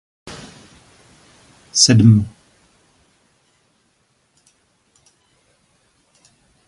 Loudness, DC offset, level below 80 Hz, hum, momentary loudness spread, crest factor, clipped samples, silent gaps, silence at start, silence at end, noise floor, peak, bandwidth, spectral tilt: -13 LUFS; under 0.1%; -48 dBFS; none; 28 LU; 22 dB; under 0.1%; none; 0.25 s; 4.4 s; -63 dBFS; 0 dBFS; 11.5 kHz; -4.5 dB/octave